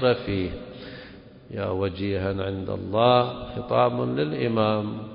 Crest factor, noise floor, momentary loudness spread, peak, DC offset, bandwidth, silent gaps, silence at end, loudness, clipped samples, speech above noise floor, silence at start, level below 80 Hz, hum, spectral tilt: 20 dB; -45 dBFS; 18 LU; -6 dBFS; under 0.1%; 5.4 kHz; none; 0 s; -25 LUFS; under 0.1%; 21 dB; 0 s; -46 dBFS; none; -11 dB/octave